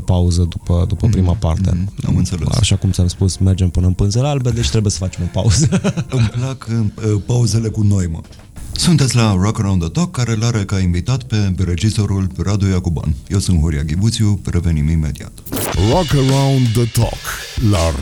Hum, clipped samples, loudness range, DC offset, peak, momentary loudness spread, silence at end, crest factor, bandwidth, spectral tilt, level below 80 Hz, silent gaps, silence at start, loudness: none; under 0.1%; 2 LU; under 0.1%; -2 dBFS; 6 LU; 0 s; 12 dB; 19.5 kHz; -6 dB/octave; -28 dBFS; none; 0 s; -16 LUFS